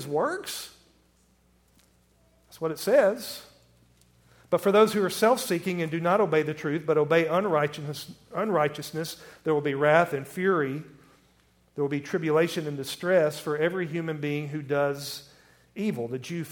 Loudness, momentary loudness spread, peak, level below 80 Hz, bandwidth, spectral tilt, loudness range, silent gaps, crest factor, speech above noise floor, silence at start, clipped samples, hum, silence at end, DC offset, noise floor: -26 LUFS; 14 LU; -6 dBFS; -68 dBFS; 18 kHz; -5.5 dB/octave; 5 LU; none; 22 dB; 38 dB; 0 s; under 0.1%; none; 0 s; under 0.1%; -64 dBFS